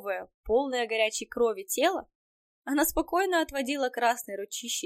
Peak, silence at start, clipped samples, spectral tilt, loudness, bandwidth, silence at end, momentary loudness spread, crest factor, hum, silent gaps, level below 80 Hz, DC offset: -12 dBFS; 0 s; under 0.1%; -1.5 dB/octave; -28 LUFS; 16 kHz; 0 s; 9 LU; 16 dB; none; 0.34-0.44 s, 2.15-2.62 s; -54 dBFS; under 0.1%